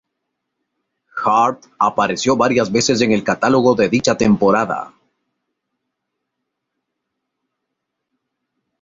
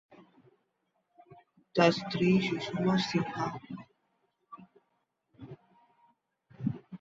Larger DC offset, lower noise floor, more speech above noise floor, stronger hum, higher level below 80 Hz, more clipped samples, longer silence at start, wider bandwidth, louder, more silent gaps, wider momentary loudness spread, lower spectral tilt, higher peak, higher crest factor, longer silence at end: neither; about the same, -77 dBFS vs -79 dBFS; first, 62 dB vs 50 dB; neither; first, -52 dBFS vs -68 dBFS; neither; first, 1.15 s vs 0.1 s; about the same, 8 kHz vs 7.8 kHz; first, -16 LUFS vs -30 LUFS; neither; second, 8 LU vs 24 LU; second, -4.5 dB/octave vs -6.5 dB/octave; first, -2 dBFS vs -10 dBFS; second, 16 dB vs 24 dB; first, 3.95 s vs 0.05 s